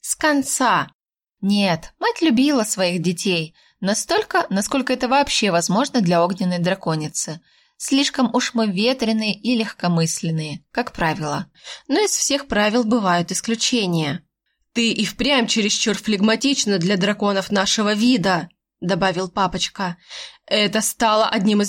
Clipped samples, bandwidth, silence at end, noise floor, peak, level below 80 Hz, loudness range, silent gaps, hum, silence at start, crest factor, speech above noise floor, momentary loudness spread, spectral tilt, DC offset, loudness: under 0.1%; 17 kHz; 0 s; -71 dBFS; -6 dBFS; -52 dBFS; 2 LU; 0.95-0.99 s; none; 0.05 s; 14 dB; 52 dB; 9 LU; -3.5 dB/octave; under 0.1%; -19 LUFS